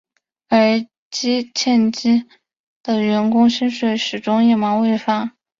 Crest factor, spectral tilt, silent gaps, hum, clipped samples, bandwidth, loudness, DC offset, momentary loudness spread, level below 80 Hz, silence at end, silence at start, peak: 14 dB; -4.5 dB/octave; 0.98-1.11 s, 2.59-2.81 s; none; under 0.1%; 7.6 kHz; -17 LUFS; under 0.1%; 7 LU; -62 dBFS; 0.3 s; 0.5 s; -2 dBFS